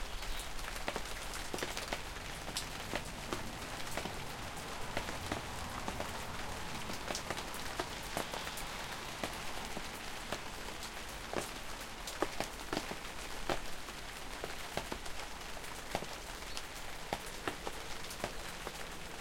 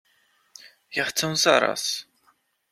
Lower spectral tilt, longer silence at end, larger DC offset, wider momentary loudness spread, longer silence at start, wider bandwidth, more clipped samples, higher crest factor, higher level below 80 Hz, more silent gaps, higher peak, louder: about the same, -3 dB/octave vs -2 dB/octave; second, 0 s vs 0.7 s; neither; second, 5 LU vs 11 LU; second, 0 s vs 0.65 s; about the same, 16.5 kHz vs 16 kHz; neither; about the same, 26 dB vs 24 dB; first, -50 dBFS vs -70 dBFS; neither; second, -16 dBFS vs -2 dBFS; second, -42 LUFS vs -23 LUFS